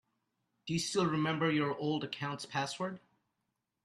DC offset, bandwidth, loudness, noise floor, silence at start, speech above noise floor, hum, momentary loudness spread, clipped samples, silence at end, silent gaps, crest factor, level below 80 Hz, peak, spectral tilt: under 0.1%; 12.5 kHz; -35 LUFS; -85 dBFS; 0.65 s; 51 dB; none; 9 LU; under 0.1%; 0.85 s; none; 18 dB; -72 dBFS; -18 dBFS; -5 dB/octave